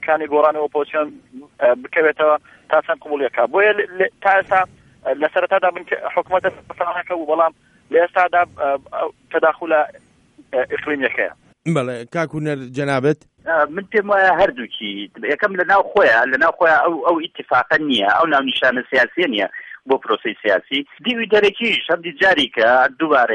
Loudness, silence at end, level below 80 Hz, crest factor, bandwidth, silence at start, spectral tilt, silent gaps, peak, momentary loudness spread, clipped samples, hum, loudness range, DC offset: -18 LUFS; 0 s; -58 dBFS; 16 dB; 10 kHz; 0 s; -5.5 dB/octave; none; -2 dBFS; 10 LU; under 0.1%; none; 5 LU; under 0.1%